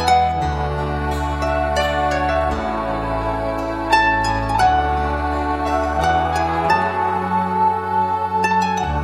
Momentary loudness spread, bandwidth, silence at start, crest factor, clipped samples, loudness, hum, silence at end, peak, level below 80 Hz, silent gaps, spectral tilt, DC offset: 6 LU; 15 kHz; 0 s; 16 dB; under 0.1%; -19 LUFS; none; 0 s; -2 dBFS; -30 dBFS; none; -5.5 dB/octave; under 0.1%